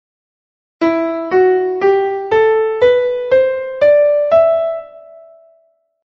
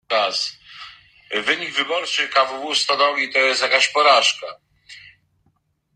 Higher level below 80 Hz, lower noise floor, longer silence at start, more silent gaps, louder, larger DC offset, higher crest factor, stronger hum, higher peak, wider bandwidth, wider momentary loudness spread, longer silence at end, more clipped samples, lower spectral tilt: first, -54 dBFS vs -70 dBFS; second, -57 dBFS vs -66 dBFS; first, 0.8 s vs 0.1 s; neither; first, -13 LUFS vs -18 LUFS; neither; second, 14 dB vs 20 dB; neither; about the same, -2 dBFS vs -2 dBFS; second, 6.6 kHz vs 11 kHz; second, 6 LU vs 20 LU; about the same, 0.9 s vs 0.95 s; neither; first, -6.5 dB/octave vs 0 dB/octave